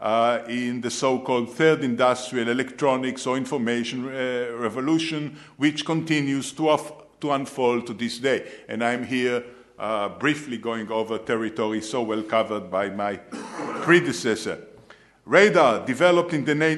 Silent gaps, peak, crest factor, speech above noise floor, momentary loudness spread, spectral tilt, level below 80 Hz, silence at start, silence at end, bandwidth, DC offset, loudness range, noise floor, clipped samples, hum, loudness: none; -2 dBFS; 22 dB; 28 dB; 10 LU; -5 dB/octave; -68 dBFS; 0 s; 0 s; 12.5 kHz; under 0.1%; 5 LU; -51 dBFS; under 0.1%; none; -24 LUFS